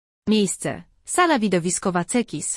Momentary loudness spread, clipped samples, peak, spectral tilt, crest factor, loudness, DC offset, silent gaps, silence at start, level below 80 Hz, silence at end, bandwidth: 9 LU; under 0.1%; -6 dBFS; -4 dB/octave; 16 dB; -22 LUFS; under 0.1%; none; 0.25 s; -56 dBFS; 0 s; 12 kHz